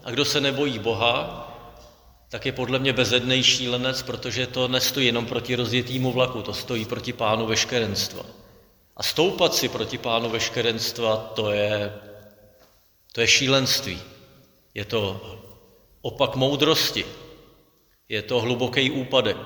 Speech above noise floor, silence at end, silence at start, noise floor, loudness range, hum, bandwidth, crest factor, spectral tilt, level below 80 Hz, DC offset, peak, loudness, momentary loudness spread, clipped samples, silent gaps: 37 dB; 0 s; 0.05 s; -61 dBFS; 4 LU; none; over 20 kHz; 22 dB; -3.5 dB/octave; -54 dBFS; under 0.1%; -4 dBFS; -23 LUFS; 15 LU; under 0.1%; none